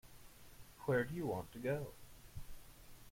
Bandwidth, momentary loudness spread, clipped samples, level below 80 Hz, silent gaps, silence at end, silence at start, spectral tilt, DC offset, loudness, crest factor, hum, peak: 16.5 kHz; 23 LU; under 0.1%; -60 dBFS; none; 0 s; 0.05 s; -6.5 dB/octave; under 0.1%; -41 LUFS; 20 dB; none; -24 dBFS